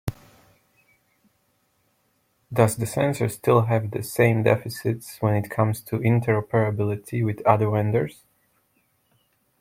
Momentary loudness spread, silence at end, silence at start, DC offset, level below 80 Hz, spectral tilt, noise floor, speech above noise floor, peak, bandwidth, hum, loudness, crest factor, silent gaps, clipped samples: 8 LU; 1.5 s; 0.05 s; under 0.1%; -56 dBFS; -7 dB/octave; -68 dBFS; 46 dB; -2 dBFS; 16.5 kHz; none; -23 LUFS; 22 dB; none; under 0.1%